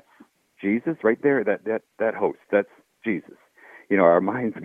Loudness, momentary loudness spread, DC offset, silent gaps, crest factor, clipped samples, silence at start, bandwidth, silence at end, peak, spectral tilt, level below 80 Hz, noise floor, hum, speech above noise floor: -23 LUFS; 12 LU; under 0.1%; none; 20 dB; under 0.1%; 0.6 s; 3.7 kHz; 0 s; -4 dBFS; -9 dB/octave; -72 dBFS; -56 dBFS; none; 33 dB